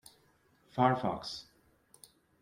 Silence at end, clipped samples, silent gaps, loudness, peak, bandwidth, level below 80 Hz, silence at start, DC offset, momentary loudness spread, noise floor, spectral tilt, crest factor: 1 s; under 0.1%; none; -33 LUFS; -14 dBFS; 16.5 kHz; -68 dBFS; 0.75 s; under 0.1%; 15 LU; -69 dBFS; -6 dB/octave; 22 dB